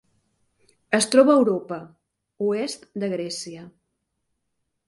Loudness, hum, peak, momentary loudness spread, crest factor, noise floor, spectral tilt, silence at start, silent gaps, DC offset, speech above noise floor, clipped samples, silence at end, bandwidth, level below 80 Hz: -22 LUFS; none; -2 dBFS; 19 LU; 22 dB; -77 dBFS; -4 dB/octave; 0.9 s; none; under 0.1%; 55 dB; under 0.1%; 1.2 s; 11.5 kHz; -70 dBFS